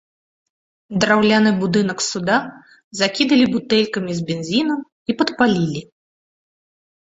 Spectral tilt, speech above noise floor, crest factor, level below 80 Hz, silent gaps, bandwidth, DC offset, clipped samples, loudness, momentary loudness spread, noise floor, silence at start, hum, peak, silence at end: -4.5 dB/octave; over 72 dB; 20 dB; -56 dBFS; 2.84-2.91 s, 4.92-5.06 s; 8 kHz; under 0.1%; under 0.1%; -18 LUFS; 11 LU; under -90 dBFS; 0.9 s; none; 0 dBFS; 1.15 s